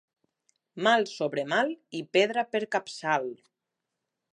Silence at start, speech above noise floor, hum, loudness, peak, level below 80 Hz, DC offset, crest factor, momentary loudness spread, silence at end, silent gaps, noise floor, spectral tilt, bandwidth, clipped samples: 0.75 s; 58 dB; none; -28 LUFS; -10 dBFS; -84 dBFS; under 0.1%; 20 dB; 7 LU; 1 s; none; -85 dBFS; -4 dB/octave; 11 kHz; under 0.1%